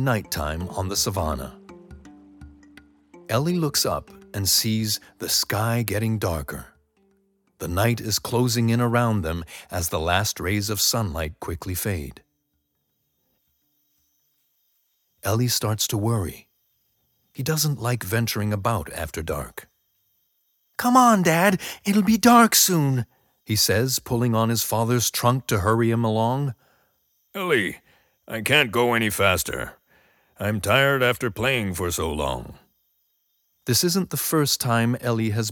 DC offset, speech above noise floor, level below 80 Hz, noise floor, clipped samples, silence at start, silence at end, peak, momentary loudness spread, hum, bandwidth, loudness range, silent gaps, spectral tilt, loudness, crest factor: under 0.1%; 51 dB; -46 dBFS; -74 dBFS; under 0.1%; 0 s; 0 s; -4 dBFS; 13 LU; none; 19 kHz; 9 LU; none; -4 dB/octave; -22 LUFS; 20 dB